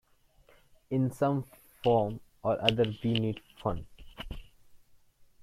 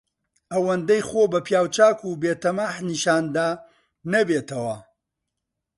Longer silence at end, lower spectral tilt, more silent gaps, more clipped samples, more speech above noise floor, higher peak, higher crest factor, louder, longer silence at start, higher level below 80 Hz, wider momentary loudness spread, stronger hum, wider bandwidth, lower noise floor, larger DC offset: second, 0.65 s vs 0.95 s; first, -7 dB/octave vs -4.5 dB/octave; neither; neither; second, 35 dB vs 60 dB; about the same, -6 dBFS vs -4 dBFS; first, 28 dB vs 20 dB; second, -31 LUFS vs -22 LUFS; first, 0.9 s vs 0.5 s; first, -52 dBFS vs -64 dBFS; first, 18 LU vs 11 LU; neither; first, 15 kHz vs 11.5 kHz; second, -64 dBFS vs -82 dBFS; neither